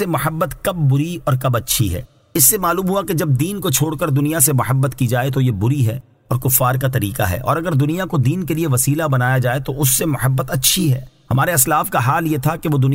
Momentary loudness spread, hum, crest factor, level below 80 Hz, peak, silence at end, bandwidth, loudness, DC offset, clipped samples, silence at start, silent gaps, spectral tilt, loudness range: 6 LU; none; 16 dB; -42 dBFS; -2 dBFS; 0 s; 16.5 kHz; -17 LUFS; under 0.1%; under 0.1%; 0 s; none; -4.5 dB/octave; 2 LU